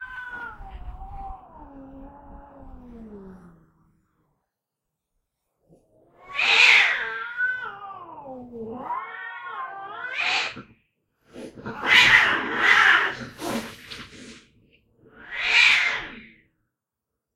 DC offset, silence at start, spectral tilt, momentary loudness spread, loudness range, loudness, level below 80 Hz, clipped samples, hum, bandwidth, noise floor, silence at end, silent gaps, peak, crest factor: under 0.1%; 0 s; -1.5 dB/octave; 25 LU; 11 LU; -19 LUFS; -50 dBFS; under 0.1%; none; 16 kHz; -84 dBFS; 1.1 s; none; -2 dBFS; 24 dB